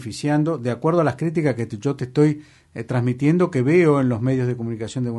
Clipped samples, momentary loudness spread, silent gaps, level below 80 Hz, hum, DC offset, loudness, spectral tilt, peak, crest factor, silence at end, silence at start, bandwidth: under 0.1%; 10 LU; none; -58 dBFS; none; under 0.1%; -20 LUFS; -8 dB/octave; -6 dBFS; 14 dB; 0 s; 0 s; 11.5 kHz